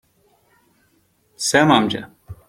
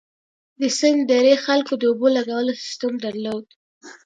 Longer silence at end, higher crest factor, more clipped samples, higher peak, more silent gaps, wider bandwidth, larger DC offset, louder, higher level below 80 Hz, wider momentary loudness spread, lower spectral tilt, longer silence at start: about the same, 0.15 s vs 0.15 s; about the same, 20 dB vs 18 dB; neither; about the same, -2 dBFS vs -2 dBFS; second, none vs 3.56-3.81 s; first, 16.5 kHz vs 9.4 kHz; neither; first, -17 LUFS vs -20 LUFS; first, -54 dBFS vs -72 dBFS; first, 16 LU vs 11 LU; about the same, -4 dB/octave vs -3 dB/octave; first, 1.4 s vs 0.6 s